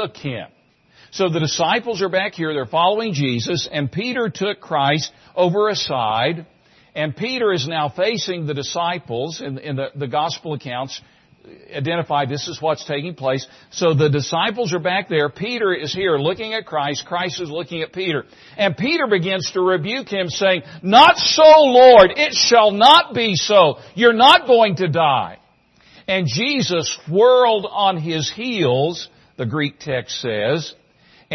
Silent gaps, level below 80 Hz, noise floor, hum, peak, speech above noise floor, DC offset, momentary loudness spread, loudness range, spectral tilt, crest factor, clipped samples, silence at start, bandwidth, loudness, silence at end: none; -56 dBFS; -54 dBFS; none; 0 dBFS; 37 dB; under 0.1%; 16 LU; 12 LU; -4 dB/octave; 18 dB; under 0.1%; 0 s; 12 kHz; -17 LUFS; 0 s